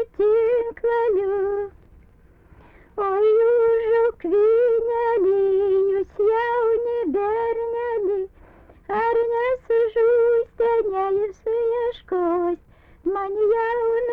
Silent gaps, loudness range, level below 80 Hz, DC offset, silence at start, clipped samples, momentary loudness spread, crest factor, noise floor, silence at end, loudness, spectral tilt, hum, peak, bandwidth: none; 4 LU; -52 dBFS; under 0.1%; 0 s; under 0.1%; 8 LU; 8 dB; -52 dBFS; 0 s; -21 LUFS; -7.5 dB/octave; none; -12 dBFS; 4.1 kHz